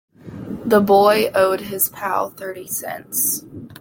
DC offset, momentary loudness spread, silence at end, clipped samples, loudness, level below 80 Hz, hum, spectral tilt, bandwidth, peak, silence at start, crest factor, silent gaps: under 0.1%; 18 LU; 0.05 s; under 0.1%; -18 LUFS; -58 dBFS; none; -3.5 dB/octave; 17 kHz; -2 dBFS; 0.25 s; 18 dB; none